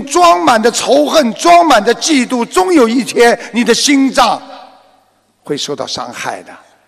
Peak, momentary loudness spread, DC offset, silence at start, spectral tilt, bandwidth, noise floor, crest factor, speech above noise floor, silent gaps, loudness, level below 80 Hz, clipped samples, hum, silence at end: 0 dBFS; 13 LU; under 0.1%; 0 s; -2.5 dB/octave; 15.5 kHz; -54 dBFS; 12 dB; 43 dB; none; -10 LUFS; -48 dBFS; under 0.1%; none; 0.35 s